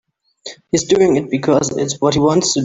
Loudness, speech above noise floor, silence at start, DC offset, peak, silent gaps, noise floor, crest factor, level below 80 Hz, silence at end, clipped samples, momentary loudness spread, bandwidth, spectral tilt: -15 LUFS; 23 dB; 0.45 s; under 0.1%; -2 dBFS; none; -37 dBFS; 14 dB; -48 dBFS; 0 s; under 0.1%; 19 LU; 8.2 kHz; -4.5 dB/octave